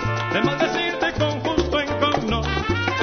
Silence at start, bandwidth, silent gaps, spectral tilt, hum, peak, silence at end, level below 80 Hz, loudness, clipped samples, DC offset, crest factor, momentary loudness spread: 0 s; 6.6 kHz; none; -5.5 dB/octave; none; -4 dBFS; 0 s; -36 dBFS; -22 LUFS; under 0.1%; under 0.1%; 18 dB; 2 LU